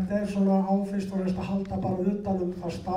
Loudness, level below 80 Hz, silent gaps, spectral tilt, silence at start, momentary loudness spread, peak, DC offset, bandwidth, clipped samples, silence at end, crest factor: -28 LUFS; -50 dBFS; none; -8.5 dB/octave; 0 s; 6 LU; -12 dBFS; under 0.1%; 10.5 kHz; under 0.1%; 0 s; 14 dB